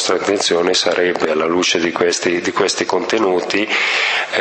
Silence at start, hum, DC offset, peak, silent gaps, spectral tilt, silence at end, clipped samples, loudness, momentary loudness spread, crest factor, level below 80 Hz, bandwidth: 0 s; none; under 0.1%; 0 dBFS; none; -2.5 dB/octave; 0 s; under 0.1%; -16 LUFS; 3 LU; 16 dB; -58 dBFS; 8.8 kHz